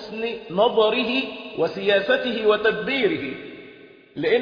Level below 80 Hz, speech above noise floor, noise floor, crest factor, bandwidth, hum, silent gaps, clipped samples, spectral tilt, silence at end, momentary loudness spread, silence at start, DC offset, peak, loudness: -60 dBFS; 25 dB; -46 dBFS; 16 dB; 5.2 kHz; none; none; under 0.1%; -6 dB/octave; 0 s; 14 LU; 0 s; under 0.1%; -6 dBFS; -22 LUFS